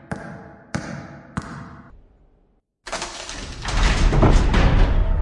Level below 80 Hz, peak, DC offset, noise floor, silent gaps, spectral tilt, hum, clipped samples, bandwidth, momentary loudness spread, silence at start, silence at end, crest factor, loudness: -22 dBFS; -2 dBFS; under 0.1%; -62 dBFS; none; -5.5 dB/octave; none; under 0.1%; 10.5 kHz; 20 LU; 0.1 s; 0 s; 18 dB; -22 LUFS